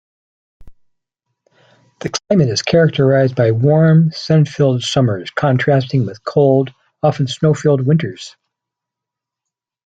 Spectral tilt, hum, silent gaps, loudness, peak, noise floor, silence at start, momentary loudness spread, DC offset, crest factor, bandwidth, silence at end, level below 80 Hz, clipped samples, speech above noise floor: -6.5 dB/octave; none; none; -15 LUFS; -2 dBFS; -83 dBFS; 0.6 s; 9 LU; under 0.1%; 14 dB; 8 kHz; 1.55 s; -52 dBFS; under 0.1%; 70 dB